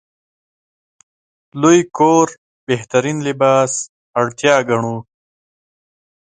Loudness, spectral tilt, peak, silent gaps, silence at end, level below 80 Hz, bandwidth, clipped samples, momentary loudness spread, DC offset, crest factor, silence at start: -15 LUFS; -4.5 dB/octave; 0 dBFS; 2.38-2.67 s, 3.89-4.14 s; 1.35 s; -60 dBFS; 9.6 kHz; under 0.1%; 11 LU; under 0.1%; 18 dB; 1.55 s